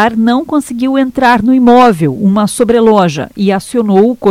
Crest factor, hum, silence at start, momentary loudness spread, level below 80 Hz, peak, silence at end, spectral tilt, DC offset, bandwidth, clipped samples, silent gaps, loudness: 8 dB; none; 0 s; 7 LU; -42 dBFS; 0 dBFS; 0 s; -6 dB/octave; under 0.1%; 15 kHz; 1%; none; -9 LUFS